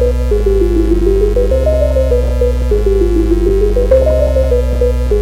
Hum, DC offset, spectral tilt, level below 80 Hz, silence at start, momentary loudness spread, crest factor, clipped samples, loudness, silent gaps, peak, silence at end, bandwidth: none; under 0.1%; -8.5 dB/octave; -14 dBFS; 0 s; 3 LU; 10 dB; under 0.1%; -13 LUFS; none; 0 dBFS; 0 s; 12 kHz